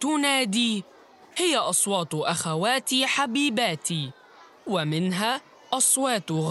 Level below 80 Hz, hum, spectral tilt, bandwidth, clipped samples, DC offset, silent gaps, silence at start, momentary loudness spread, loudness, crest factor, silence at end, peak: -76 dBFS; none; -3 dB/octave; 15.5 kHz; under 0.1%; under 0.1%; none; 0 s; 10 LU; -24 LUFS; 18 dB; 0 s; -8 dBFS